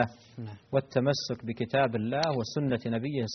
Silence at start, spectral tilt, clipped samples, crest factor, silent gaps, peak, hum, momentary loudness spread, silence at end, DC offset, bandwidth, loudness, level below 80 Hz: 0 s; -5 dB/octave; under 0.1%; 20 dB; none; -10 dBFS; none; 8 LU; 0 s; under 0.1%; 6.4 kHz; -30 LUFS; -64 dBFS